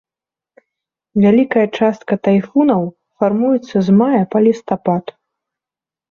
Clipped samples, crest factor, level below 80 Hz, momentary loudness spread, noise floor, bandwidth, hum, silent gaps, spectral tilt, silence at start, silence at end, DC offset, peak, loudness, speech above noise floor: under 0.1%; 14 dB; -58 dBFS; 7 LU; -89 dBFS; 7 kHz; none; none; -8.5 dB/octave; 1.15 s; 1 s; under 0.1%; -2 dBFS; -15 LUFS; 75 dB